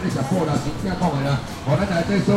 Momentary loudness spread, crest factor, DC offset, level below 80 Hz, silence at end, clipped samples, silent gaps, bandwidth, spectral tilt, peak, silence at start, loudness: 4 LU; 14 dB; under 0.1%; -40 dBFS; 0 s; under 0.1%; none; 14 kHz; -6.5 dB/octave; -6 dBFS; 0 s; -22 LUFS